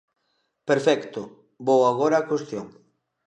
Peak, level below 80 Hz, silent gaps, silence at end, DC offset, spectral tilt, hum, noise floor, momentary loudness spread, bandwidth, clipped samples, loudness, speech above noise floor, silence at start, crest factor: -6 dBFS; -74 dBFS; none; 0.6 s; under 0.1%; -5.5 dB/octave; none; -73 dBFS; 18 LU; 9.8 kHz; under 0.1%; -22 LUFS; 51 dB; 0.65 s; 18 dB